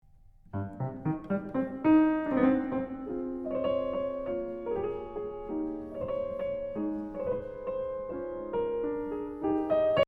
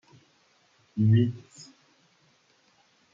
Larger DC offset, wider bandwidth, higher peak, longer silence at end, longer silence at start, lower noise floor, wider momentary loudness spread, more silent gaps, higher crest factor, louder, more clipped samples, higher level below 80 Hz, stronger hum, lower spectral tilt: neither; second, 4.9 kHz vs 7.6 kHz; about the same, -12 dBFS vs -12 dBFS; second, 0.05 s vs 1.5 s; second, 0.55 s vs 0.95 s; second, -56 dBFS vs -65 dBFS; second, 10 LU vs 27 LU; neither; about the same, 18 dB vs 18 dB; second, -32 LUFS vs -25 LUFS; neither; first, -56 dBFS vs -72 dBFS; neither; about the same, -9.5 dB/octave vs -8.5 dB/octave